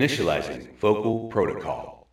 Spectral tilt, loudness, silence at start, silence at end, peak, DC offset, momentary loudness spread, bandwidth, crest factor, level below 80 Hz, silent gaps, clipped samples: -5.5 dB/octave; -26 LUFS; 0 s; 0.15 s; -8 dBFS; under 0.1%; 11 LU; 14.5 kHz; 18 dB; -52 dBFS; none; under 0.1%